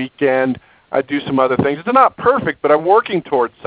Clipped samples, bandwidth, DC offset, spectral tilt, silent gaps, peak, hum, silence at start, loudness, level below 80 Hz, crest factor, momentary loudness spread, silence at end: under 0.1%; 4 kHz; under 0.1%; -10 dB/octave; none; 0 dBFS; none; 0 s; -16 LUFS; -50 dBFS; 16 dB; 8 LU; 0.2 s